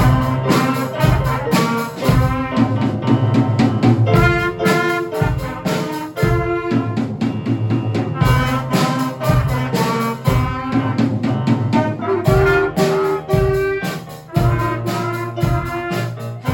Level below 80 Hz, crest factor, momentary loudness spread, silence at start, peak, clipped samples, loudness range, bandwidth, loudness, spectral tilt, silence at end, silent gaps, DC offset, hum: -32 dBFS; 16 dB; 7 LU; 0 s; -2 dBFS; under 0.1%; 3 LU; 17.5 kHz; -17 LUFS; -7 dB/octave; 0 s; none; under 0.1%; none